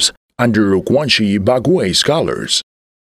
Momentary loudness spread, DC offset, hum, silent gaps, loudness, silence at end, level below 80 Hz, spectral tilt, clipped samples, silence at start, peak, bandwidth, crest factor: 4 LU; under 0.1%; none; 0.17-0.29 s; -14 LUFS; 0.6 s; -46 dBFS; -4 dB/octave; under 0.1%; 0 s; 0 dBFS; 15 kHz; 14 dB